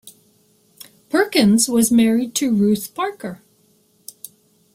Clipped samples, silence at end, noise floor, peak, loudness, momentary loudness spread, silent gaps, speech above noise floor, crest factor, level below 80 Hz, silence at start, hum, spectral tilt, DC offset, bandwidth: under 0.1%; 1.4 s; -58 dBFS; -2 dBFS; -17 LUFS; 22 LU; none; 42 dB; 18 dB; -58 dBFS; 0.05 s; none; -4 dB/octave; under 0.1%; 16.5 kHz